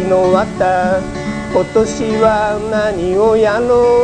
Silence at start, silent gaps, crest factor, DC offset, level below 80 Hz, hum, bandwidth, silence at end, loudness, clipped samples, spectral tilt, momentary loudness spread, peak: 0 s; none; 12 dB; 0.2%; -36 dBFS; none; 10 kHz; 0 s; -14 LUFS; under 0.1%; -6 dB/octave; 6 LU; 0 dBFS